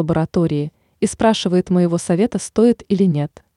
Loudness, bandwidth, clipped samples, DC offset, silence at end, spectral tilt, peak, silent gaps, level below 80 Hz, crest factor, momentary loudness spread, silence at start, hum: -18 LUFS; 11.5 kHz; under 0.1%; under 0.1%; 0.3 s; -6.5 dB/octave; -4 dBFS; none; -48 dBFS; 14 dB; 7 LU; 0 s; none